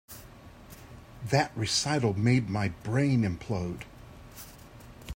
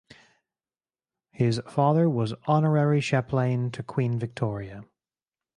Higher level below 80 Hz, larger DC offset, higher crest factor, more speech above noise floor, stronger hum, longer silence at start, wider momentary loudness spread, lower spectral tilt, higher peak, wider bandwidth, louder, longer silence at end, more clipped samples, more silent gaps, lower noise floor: first, -54 dBFS vs -60 dBFS; neither; about the same, 20 dB vs 18 dB; second, 22 dB vs over 66 dB; neither; second, 0.1 s vs 1.4 s; first, 23 LU vs 9 LU; second, -5 dB/octave vs -7.5 dB/octave; about the same, -10 dBFS vs -8 dBFS; first, 16 kHz vs 10.5 kHz; second, -28 LUFS vs -25 LUFS; second, 0 s vs 0.75 s; neither; neither; second, -50 dBFS vs under -90 dBFS